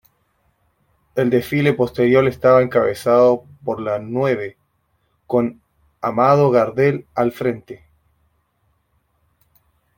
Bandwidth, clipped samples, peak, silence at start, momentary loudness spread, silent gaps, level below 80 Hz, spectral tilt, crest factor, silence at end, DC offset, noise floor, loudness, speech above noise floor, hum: 17 kHz; under 0.1%; -2 dBFS; 1.15 s; 12 LU; none; -56 dBFS; -7.5 dB/octave; 18 dB; 2.2 s; under 0.1%; -66 dBFS; -18 LUFS; 49 dB; none